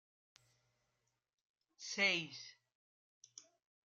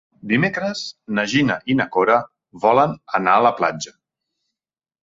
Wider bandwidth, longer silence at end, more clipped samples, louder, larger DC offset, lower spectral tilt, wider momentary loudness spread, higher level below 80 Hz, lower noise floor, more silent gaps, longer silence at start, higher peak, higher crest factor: first, 13 kHz vs 7.8 kHz; second, 0.45 s vs 1.15 s; neither; second, -37 LUFS vs -19 LUFS; neither; second, -2 dB/octave vs -5 dB/octave; first, 25 LU vs 11 LU; second, under -90 dBFS vs -60 dBFS; about the same, -86 dBFS vs -89 dBFS; first, 2.75-3.21 s vs none; first, 1.8 s vs 0.25 s; second, -22 dBFS vs -2 dBFS; first, 26 dB vs 18 dB